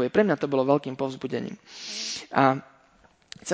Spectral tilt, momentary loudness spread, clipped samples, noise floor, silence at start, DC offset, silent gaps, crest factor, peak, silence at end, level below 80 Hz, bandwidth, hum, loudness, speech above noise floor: -5 dB/octave; 16 LU; under 0.1%; -60 dBFS; 0 s; under 0.1%; none; 22 dB; -4 dBFS; 0 s; -66 dBFS; 8 kHz; none; -26 LUFS; 34 dB